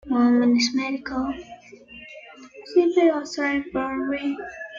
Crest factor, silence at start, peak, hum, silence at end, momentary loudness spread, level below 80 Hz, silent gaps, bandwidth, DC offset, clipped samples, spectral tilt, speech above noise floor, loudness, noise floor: 16 dB; 0.05 s; -8 dBFS; none; 0 s; 24 LU; -56 dBFS; none; 7.6 kHz; under 0.1%; under 0.1%; -4 dB/octave; 23 dB; -22 LUFS; -45 dBFS